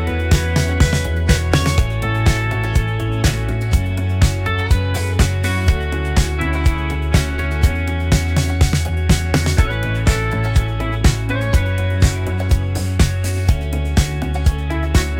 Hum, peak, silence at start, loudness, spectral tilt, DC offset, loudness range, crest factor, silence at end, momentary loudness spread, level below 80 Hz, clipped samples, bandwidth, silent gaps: none; 0 dBFS; 0 s; -18 LUFS; -5.5 dB/octave; under 0.1%; 1 LU; 16 dB; 0 s; 3 LU; -22 dBFS; under 0.1%; 17 kHz; none